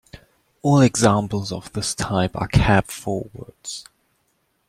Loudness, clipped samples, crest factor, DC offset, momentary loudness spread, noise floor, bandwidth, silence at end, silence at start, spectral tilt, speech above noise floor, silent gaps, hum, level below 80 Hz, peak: -20 LUFS; under 0.1%; 20 dB; under 0.1%; 17 LU; -68 dBFS; 15 kHz; 0.85 s; 0.15 s; -5.5 dB/octave; 48 dB; none; none; -38 dBFS; -2 dBFS